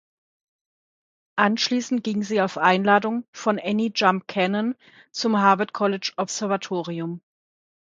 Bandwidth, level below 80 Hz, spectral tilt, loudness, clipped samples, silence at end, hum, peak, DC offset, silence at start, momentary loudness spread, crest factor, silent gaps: 9 kHz; -72 dBFS; -4.5 dB/octave; -23 LUFS; under 0.1%; 0.8 s; none; -2 dBFS; under 0.1%; 1.35 s; 11 LU; 22 dB; 3.28-3.33 s